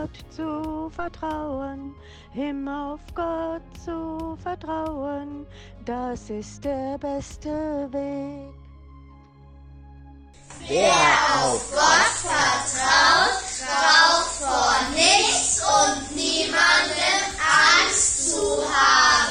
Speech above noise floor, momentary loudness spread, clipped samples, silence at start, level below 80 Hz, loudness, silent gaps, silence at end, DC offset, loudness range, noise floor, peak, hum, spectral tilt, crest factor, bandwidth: 24 dB; 18 LU; under 0.1%; 0 s; -46 dBFS; -20 LUFS; none; 0 s; under 0.1%; 14 LU; -47 dBFS; -2 dBFS; none; -1 dB/octave; 20 dB; 12.5 kHz